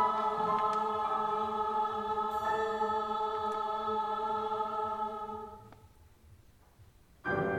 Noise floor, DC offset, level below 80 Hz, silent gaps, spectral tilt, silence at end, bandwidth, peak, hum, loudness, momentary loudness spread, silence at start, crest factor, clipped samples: -60 dBFS; under 0.1%; -62 dBFS; none; -5.5 dB/octave; 0 s; 15 kHz; -18 dBFS; none; -33 LUFS; 8 LU; 0 s; 16 dB; under 0.1%